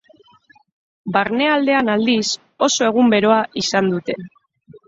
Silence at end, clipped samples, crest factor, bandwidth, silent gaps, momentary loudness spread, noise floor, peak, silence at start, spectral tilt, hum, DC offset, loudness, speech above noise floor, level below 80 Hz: 0.1 s; under 0.1%; 16 dB; 7.8 kHz; none; 9 LU; -53 dBFS; -2 dBFS; 1.05 s; -4 dB/octave; none; under 0.1%; -17 LUFS; 36 dB; -60 dBFS